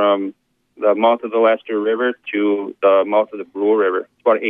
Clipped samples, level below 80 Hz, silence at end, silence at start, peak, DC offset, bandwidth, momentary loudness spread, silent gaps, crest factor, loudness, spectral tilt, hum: under 0.1%; -76 dBFS; 0 s; 0 s; -2 dBFS; under 0.1%; 3.8 kHz; 6 LU; none; 14 dB; -18 LUFS; -8 dB/octave; none